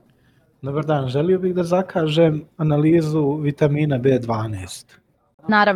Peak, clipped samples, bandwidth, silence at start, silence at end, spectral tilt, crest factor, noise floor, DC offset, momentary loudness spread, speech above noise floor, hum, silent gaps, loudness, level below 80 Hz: -4 dBFS; under 0.1%; 12 kHz; 0.65 s; 0 s; -7.5 dB/octave; 16 dB; -58 dBFS; under 0.1%; 12 LU; 39 dB; none; 5.34-5.38 s; -19 LUFS; -54 dBFS